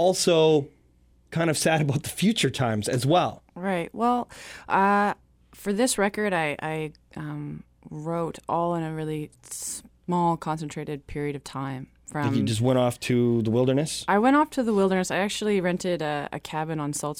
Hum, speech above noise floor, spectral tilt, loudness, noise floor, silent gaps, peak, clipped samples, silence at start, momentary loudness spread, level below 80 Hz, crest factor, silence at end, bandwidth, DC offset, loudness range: none; 35 dB; -5 dB/octave; -25 LUFS; -60 dBFS; none; -8 dBFS; under 0.1%; 0 s; 14 LU; -56 dBFS; 18 dB; 0 s; 18 kHz; under 0.1%; 7 LU